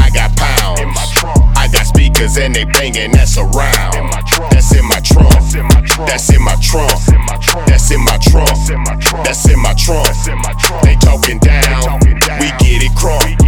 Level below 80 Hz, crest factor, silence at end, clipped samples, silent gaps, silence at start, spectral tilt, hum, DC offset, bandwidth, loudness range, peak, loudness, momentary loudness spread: -10 dBFS; 8 dB; 0 s; under 0.1%; none; 0 s; -4 dB/octave; none; under 0.1%; over 20 kHz; 1 LU; 0 dBFS; -10 LUFS; 4 LU